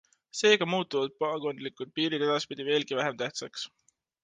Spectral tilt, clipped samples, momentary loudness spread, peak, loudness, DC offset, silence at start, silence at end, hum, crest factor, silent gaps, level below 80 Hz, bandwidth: -3.5 dB/octave; under 0.1%; 14 LU; -8 dBFS; -29 LUFS; under 0.1%; 0.35 s; 0.55 s; none; 22 dB; none; -78 dBFS; 9.6 kHz